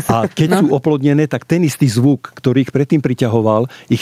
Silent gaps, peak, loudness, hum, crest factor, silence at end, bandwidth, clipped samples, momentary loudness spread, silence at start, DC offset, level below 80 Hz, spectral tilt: none; -2 dBFS; -15 LUFS; none; 12 dB; 0 s; 15.5 kHz; under 0.1%; 3 LU; 0 s; under 0.1%; -52 dBFS; -7 dB/octave